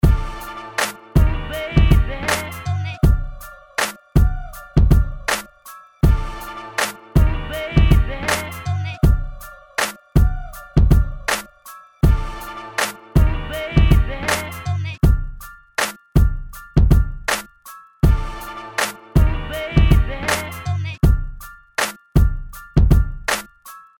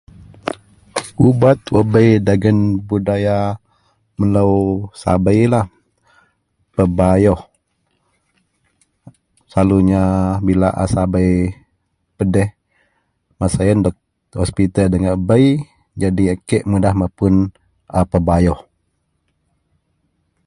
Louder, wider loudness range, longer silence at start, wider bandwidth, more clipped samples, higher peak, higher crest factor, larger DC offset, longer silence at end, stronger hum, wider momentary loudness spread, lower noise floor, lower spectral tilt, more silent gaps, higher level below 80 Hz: second, -20 LUFS vs -16 LUFS; second, 1 LU vs 5 LU; second, 0.05 s vs 0.45 s; first, 18.5 kHz vs 11.5 kHz; neither; second, -4 dBFS vs 0 dBFS; about the same, 14 dB vs 16 dB; neither; second, 0.2 s vs 1.85 s; neither; first, 15 LU vs 12 LU; second, -42 dBFS vs -67 dBFS; second, -5.5 dB/octave vs -8 dB/octave; neither; first, -20 dBFS vs -32 dBFS